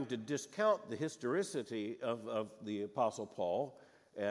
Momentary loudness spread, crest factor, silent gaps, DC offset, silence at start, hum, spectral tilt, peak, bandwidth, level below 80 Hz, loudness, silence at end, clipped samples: 8 LU; 20 dB; none; under 0.1%; 0 s; none; -5 dB/octave; -20 dBFS; 12 kHz; -88 dBFS; -39 LUFS; 0 s; under 0.1%